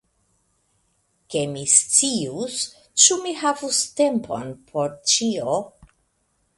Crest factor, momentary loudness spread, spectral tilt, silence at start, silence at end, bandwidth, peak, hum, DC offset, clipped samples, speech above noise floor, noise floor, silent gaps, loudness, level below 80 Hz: 24 dB; 13 LU; -2 dB/octave; 1.3 s; 0.9 s; 11.5 kHz; 0 dBFS; none; under 0.1%; under 0.1%; 47 dB; -69 dBFS; none; -20 LUFS; -64 dBFS